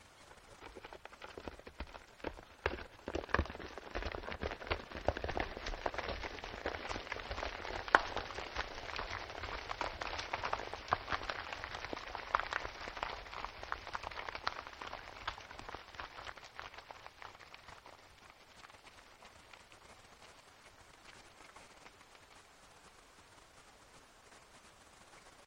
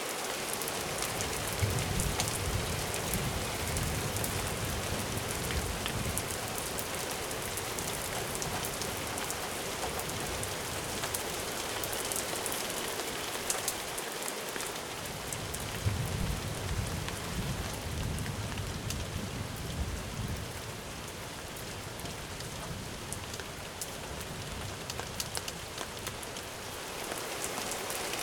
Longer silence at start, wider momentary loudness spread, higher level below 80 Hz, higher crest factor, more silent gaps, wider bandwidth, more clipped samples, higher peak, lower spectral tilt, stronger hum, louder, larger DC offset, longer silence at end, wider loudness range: about the same, 0 s vs 0 s; first, 21 LU vs 7 LU; second, -54 dBFS vs -46 dBFS; first, 42 dB vs 28 dB; neither; second, 16 kHz vs 18 kHz; neither; first, -2 dBFS vs -8 dBFS; about the same, -4 dB/octave vs -3 dB/octave; neither; second, -42 LUFS vs -35 LUFS; neither; about the same, 0 s vs 0 s; first, 19 LU vs 7 LU